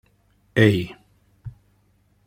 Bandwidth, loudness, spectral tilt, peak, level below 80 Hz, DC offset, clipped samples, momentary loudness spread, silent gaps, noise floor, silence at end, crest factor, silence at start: 15.5 kHz; -20 LUFS; -7 dB/octave; -2 dBFS; -54 dBFS; under 0.1%; under 0.1%; 24 LU; none; -62 dBFS; 0.75 s; 22 dB; 0.55 s